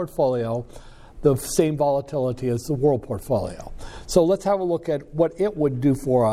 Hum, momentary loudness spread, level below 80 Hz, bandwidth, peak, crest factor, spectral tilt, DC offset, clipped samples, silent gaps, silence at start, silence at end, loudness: none; 9 LU; -44 dBFS; 16 kHz; -4 dBFS; 18 dB; -6.5 dB/octave; under 0.1%; under 0.1%; none; 0 s; 0 s; -23 LUFS